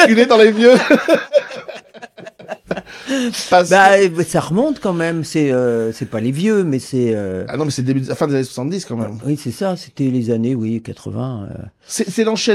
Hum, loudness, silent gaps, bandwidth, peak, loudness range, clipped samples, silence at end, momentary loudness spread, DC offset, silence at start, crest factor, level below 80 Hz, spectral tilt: none; -16 LUFS; none; 14.5 kHz; 0 dBFS; 6 LU; under 0.1%; 0 s; 17 LU; under 0.1%; 0 s; 16 dB; -54 dBFS; -5 dB/octave